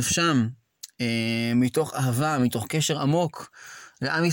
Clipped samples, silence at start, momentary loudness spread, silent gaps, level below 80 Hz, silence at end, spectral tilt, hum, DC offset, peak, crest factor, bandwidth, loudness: under 0.1%; 0 s; 19 LU; none; -60 dBFS; 0 s; -4.5 dB/octave; none; under 0.1%; -10 dBFS; 16 dB; 17 kHz; -25 LUFS